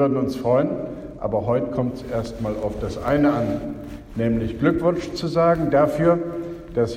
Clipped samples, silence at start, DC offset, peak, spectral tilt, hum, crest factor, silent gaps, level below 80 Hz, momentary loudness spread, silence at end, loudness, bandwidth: under 0.1%; 0 s; under 0.1%; -4 dBFS; -8 dB/octave; none; 16 dB; none; -42 dBFS; 11 LU; 0 s; -22 LUFS; 15.5 kHz